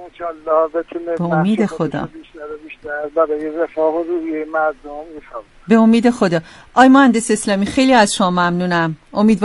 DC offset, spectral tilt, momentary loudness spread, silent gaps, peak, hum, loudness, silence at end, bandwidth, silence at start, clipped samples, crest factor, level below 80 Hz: under 0.1%; -5.5 dB/octave; 20 LU; none; 0 dBFS; none; -16 LUFS; 0 s; 11.5 kHz; 0 s; under 0.1%; 16 dB; -50 dBFS